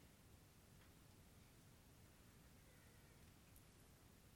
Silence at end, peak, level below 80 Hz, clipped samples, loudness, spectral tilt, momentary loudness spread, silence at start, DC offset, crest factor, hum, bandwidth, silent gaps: 0 s; -48 dBFS; -76 dBFS; under 0.1%; -68 LUFS; -4 dB/octave; 1 LU; 0 s; under 0.1%; 20 dB; none; 17 kHz; none